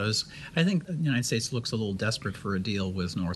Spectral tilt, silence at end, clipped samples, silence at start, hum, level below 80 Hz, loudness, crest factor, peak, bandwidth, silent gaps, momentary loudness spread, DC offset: -5 dB/octave; 0 s; under 0.1%; 0 s; none; -56 dBFS; -29 LUFS; 18 dB; -10 dBFS; 12.5 kHz; none; 5 LU; under 0.1%